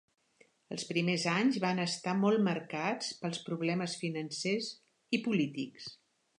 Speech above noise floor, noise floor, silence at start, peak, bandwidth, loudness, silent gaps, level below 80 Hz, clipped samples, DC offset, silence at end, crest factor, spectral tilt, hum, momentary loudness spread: 35 dB; -68 dBFS; 0.7 s; -16 dBFS; 11 kHz; -33 LUFS; none; -82 dBFS; under 0.1%; under 0.1%; 0.45 s; 18 dB; -5 dB/octave; none; 12 LU